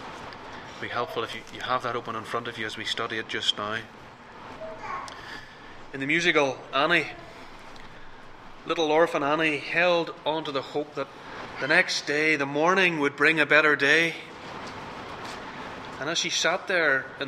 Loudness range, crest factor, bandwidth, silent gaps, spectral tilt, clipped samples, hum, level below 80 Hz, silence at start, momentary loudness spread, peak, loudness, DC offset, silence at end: 9 LU; 22 dB; 15 kHz; none; -3 dB/octave; under 0.1%; none; -56 dBFS; 0 s; 20 LU; -6 dBFS; -25 LUFS; under 0.1%; 0 s